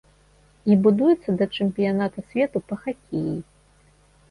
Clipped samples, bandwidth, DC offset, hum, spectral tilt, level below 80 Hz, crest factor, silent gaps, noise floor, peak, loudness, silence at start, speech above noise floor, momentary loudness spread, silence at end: under 0.1%; 10.5 kHz; under 0.1%; none; -8.5 dB/octave; -58 dBFS; 16 dB; none; -57 dBFS; -6 dBFS; -23 LUFS; 0.65 s; 35 dB; 12 LU; 0.9 s